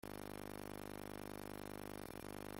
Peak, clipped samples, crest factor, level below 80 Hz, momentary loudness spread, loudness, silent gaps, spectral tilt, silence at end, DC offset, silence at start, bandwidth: -34 dBFS; under 0.1%; 16 dB; -64 dBFS; 0 LU; -50 LUFS; none; -5 dB/octave; 0 s; under 0.1%; 0.05 s; 17 kHz